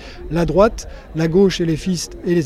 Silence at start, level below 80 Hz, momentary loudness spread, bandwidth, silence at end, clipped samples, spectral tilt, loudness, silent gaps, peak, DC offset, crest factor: 0 s; -32 dBFS; 10 LU; 14.5 kHz; 0 s; under 0.1%; -6 dB/octave; -18 LUFS; none; 0 dBFS; under 0.1%; 18 dB